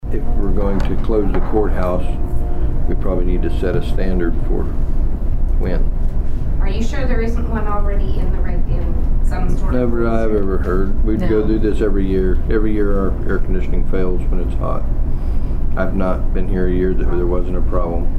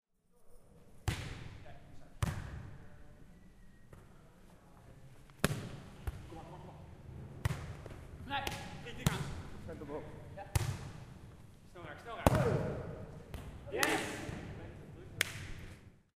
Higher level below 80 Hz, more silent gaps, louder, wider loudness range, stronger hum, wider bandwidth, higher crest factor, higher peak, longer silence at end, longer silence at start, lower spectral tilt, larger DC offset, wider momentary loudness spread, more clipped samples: first, -16 dBFS vs -52 dBFS; neither; first, -20 LUFS vs -40 LUFS; second, 3 LU vs 10 LU; neither; second, 4.5 kHz vs 15.5 kHz; second, 10 dB vs 36 dB; about the same, -4 dBFS vs -6 dBFS; second, 0 s vs 0.15 s; second, 0.05 s vs 0.35 s; first, -9 dB/octave vs -5 dB/octave; neither; second, 5 LU vs 24 LU; neither